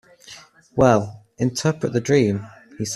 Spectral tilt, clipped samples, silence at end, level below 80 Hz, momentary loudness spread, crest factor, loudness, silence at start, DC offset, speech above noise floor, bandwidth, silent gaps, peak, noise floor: -6 dB/octave; under 0.1%; 0 s; -50 dBFS; 24 LU; 20 dB; -21 LUFS; 0.3 s; under 0.1%; 26 dB; 13.5 kHz; none; -2 dBFS; -45 dBFS